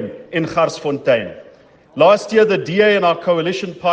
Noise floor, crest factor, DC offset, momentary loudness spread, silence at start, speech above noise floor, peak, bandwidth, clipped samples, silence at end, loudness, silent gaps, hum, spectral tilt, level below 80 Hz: -46 dBFS; 16 dB; under 0.1%; 9 LU; 0 s; 31 dB; 0 dBFS; 9 kHz; under 0.1%; 0 s; -16 LUFS; none; none; -5.5 dB/octave; -58 dBFS